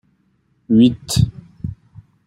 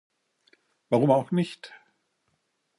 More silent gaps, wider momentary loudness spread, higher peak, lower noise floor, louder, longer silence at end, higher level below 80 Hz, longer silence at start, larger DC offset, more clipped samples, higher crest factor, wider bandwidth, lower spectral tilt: neither; second, 18 LU vs 22 LU; first, -2 dBFS vs -8 dBFS; second, -62 dBFS vs -75 dBFS; first, -16 LUFS vs -25 LUFS; second, 0.55 s vs 1.1 s; first, -42 dBFS vs -78 dBFS; second, 0.7 s vs 0.9 s; neither; neither; second, 16 dB vs 22 dB; first, 16 kHz vs 11.5 kHz; second, -6.5 dB/octave vs -8 dB/octave